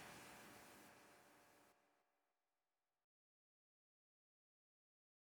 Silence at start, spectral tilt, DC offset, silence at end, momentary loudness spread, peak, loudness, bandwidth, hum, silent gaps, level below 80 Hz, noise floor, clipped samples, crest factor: 0 s; -2.5 dB/octave; under 0.1%; 3.15 s; 9 LU; -46 dBFS; -62 LUFS; over 20 kHz; none; none; under -90 dBFS; under -90 dBFS; under 0.1%; 22 dB